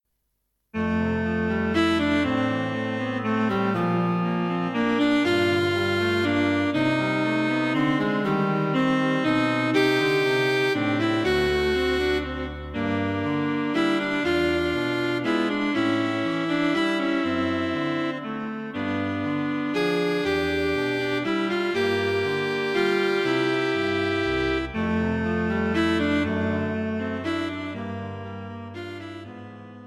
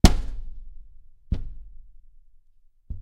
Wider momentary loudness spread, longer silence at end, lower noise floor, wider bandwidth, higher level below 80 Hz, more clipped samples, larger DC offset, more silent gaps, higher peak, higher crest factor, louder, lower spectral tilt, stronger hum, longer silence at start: second, 8 LU vs 20 LU; about the same, 0 s vs 0 s; first, -75 dBFS vs -56 dBFS; second, 13.5 kHz vs 16 kHz; second, -48 dBFS vs -28 dBFS; neither; neither; neither; second, -8 dBFS vs 0 dBFS; second, 16 dB vs 26 dB; first, -24 LUFS vs -29 LUFS; about the same, -6 dB/octave vs -5.5 dB/octave; neither; first, 0.75 s vs 0.05 s